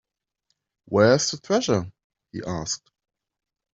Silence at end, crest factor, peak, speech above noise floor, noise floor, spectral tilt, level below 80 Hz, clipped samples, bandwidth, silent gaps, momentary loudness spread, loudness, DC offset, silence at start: 0.95 s; 22 dB; -4 dBFS; 53 dB; -76 dBFS; -4.5 dB/octave; -58 dBFS; under 0.1%; 8.2 kHz; 2.04-2.10 s; 17 LU; -23 LUFS; under 0.1%; 0.9 s